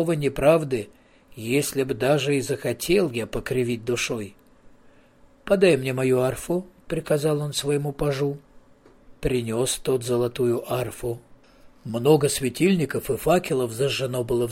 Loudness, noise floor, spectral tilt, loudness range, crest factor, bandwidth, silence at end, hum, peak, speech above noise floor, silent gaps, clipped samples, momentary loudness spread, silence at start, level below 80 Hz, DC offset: -24 LUFS; -54 dBFS; -5 dB/octave; 3 LU; 18 dB; 16.5 kHz; 0 s; none; -6 dBFS; 31 dB; none; under 0.1%; 12 LU; 0 s; -48 dBFS; under 0.1%